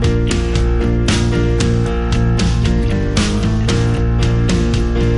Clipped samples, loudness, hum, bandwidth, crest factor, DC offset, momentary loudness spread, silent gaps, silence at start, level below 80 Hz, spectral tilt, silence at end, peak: under 0.1%; -16 LUFS; none; 11.5 kHz; 12 dB; under 0.1%; 2 LU; none; 0 s; -18 dBFS; -6 dB/octave; 0 s; -2 dBFS